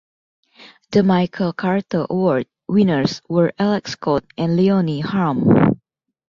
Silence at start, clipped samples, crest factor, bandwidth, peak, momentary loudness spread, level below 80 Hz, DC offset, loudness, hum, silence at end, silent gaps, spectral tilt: 0.6 s; under 0.1%; 16 dB; 7.4 kHz; -2 dBFS; 6 LU; -52 dBFS; under 0.1%; -18 LUFS; none; 0.55 s; none; -7.5 dB/octave